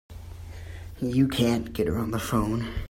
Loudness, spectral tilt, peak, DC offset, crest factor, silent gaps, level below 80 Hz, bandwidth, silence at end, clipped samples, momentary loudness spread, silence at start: -26 LUFS; -6 dB/octave; -10 dBFS; under 0.1%; 18 dB; none; -42 dBFS; 16 kHz; 0 s; under 0.1%; 19 LU; 0.1 s